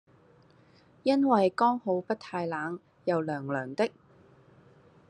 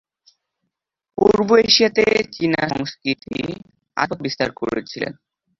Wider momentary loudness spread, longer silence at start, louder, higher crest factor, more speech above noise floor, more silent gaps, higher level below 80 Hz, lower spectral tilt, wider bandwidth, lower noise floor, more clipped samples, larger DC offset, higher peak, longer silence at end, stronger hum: second, 10 LU vs 15 LU; second, 1.05 s vs 1.2 s; second, -29 LUFS vs -19 LUFS; about the same, 20 dB vs 20 dB; second, 32 dB vs 59 dB; neither; second, -78 dBFS vs -52 dBFS; first, -7 dB/octave vs -4 dB/octave; first, 10.5 kHz vs 7.6 kHz; second, -60 dBFS vs -78 dBFS; neither; neither; second, -10 dBFS vs 0 dBFS; first, 1.2 s vs 0.5 s; neither